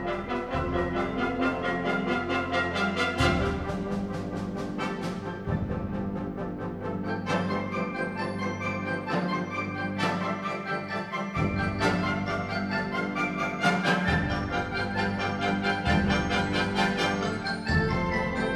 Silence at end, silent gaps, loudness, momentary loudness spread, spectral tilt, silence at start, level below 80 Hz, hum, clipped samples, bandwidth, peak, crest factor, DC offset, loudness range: 0 s; none; -28 LUFS; 7 LU; -6 dB/octave; 0 s; -44 dBFS; none; under 0.1%; 12.5 kHz; -10 dBFS; 18 dB; under 0.1%; 5 LU